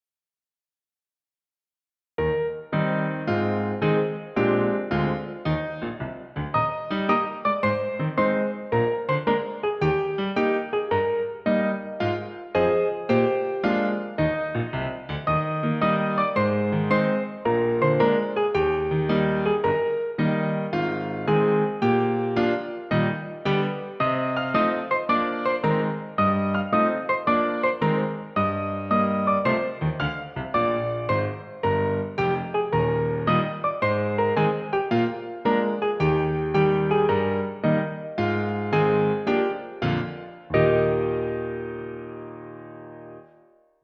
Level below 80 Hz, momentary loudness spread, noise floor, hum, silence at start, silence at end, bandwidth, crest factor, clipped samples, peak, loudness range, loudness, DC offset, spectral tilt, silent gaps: -50 dBFS; 7 LU; under -90 dBFS; none; 2.2 s; 0.6 s; 6.2 kHz; 16 dB; under 0.1%; -8 dBFS; 3 LU; -24 LUFS; under 0.1%; -9 dB/octave; none